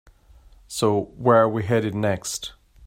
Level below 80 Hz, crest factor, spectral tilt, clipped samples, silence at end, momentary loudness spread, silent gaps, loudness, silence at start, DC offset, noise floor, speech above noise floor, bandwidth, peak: -52 dBFS; 20 dB; -5.5 dB/octave; under 0.1%; 0 s; 14 LU; none; -22 LUFS; 0.7 s; under 0.1%; -51 dBFS; 30 dB; 16 kHz; -4 dBFS